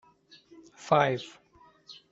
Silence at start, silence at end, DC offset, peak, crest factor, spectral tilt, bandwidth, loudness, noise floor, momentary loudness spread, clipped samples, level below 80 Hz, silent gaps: 0.8 s; 0.2 s; under 0.1%; -8 dBFS; 24 dB; -5.5 dB/octave; 8 kHz; -27 LUFS; -58 dBFS; 25 LU; under 0.1%; -72 dBFS; none